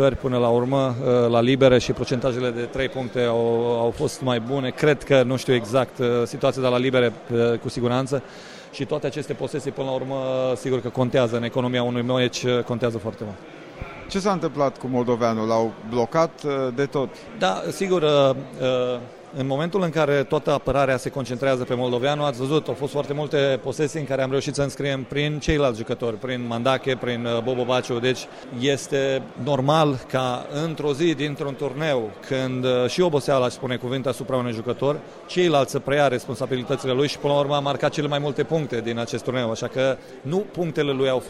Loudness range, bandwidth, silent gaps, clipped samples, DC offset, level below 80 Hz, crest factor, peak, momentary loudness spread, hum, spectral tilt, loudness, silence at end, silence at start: 3 LU; 14 kHz; none; under 0.1%; under 0.1%; -48 dBFS; 18 dB; -4 dBFS; 7 LU; none; -6 dB/octave; -23 LUFS; 0 s; 0 s